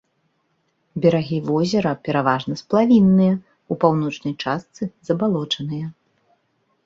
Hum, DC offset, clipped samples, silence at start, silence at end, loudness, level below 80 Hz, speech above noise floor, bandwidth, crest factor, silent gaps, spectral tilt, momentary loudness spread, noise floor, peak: none; under 0.1%; under 0.1%; 0.95 s; 0.95 s; -20 LUFS; -58 dBFS; 49 dB; 7.6 kHz; 18 dB; none; -7 dB/octave; 15 LU; -68 dBFS; -2 dBFS